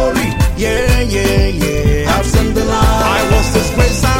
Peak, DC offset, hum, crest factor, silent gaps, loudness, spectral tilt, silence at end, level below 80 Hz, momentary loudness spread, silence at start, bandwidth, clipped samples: -2 dBFS; under 0.1%; none; 10 dB; none; -13 LUFS; -5 dB/octave; 0 s; -16 dBFS; 3 LU; 0 s; 16.5 kHz; under 0.1%